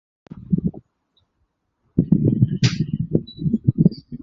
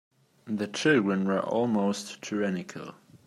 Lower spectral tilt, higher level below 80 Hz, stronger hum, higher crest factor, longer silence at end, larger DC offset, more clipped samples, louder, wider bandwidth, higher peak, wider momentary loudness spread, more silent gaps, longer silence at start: first, -7.5 dB/octave vs -5.5 dB/octave; first, -44 dBFS vs -74 dBFS; neither; about the same, 20 dB vs 18 dB; about the same, 0.05 s vs 0.1 s; neither; neither; first, -21 LUFS vs -28 LUFS; second, 7.6 kHz vs 12.5 kHz; first, -2 dBFS vs -12 dBFS; second, 7 LU vs 14 LU; neither; about the same, 0.35 s vs 0.45 s